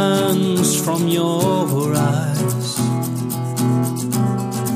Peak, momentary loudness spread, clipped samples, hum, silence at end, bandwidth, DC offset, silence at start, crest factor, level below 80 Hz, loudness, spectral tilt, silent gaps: -4 dBFS; 5 LU; under 0.1%; none; 0 s; 15.5 kHz; under 0.1%; 0 s; 14 dB; -56 dBFS; -19 LUFS; -5.5 dB/octave; none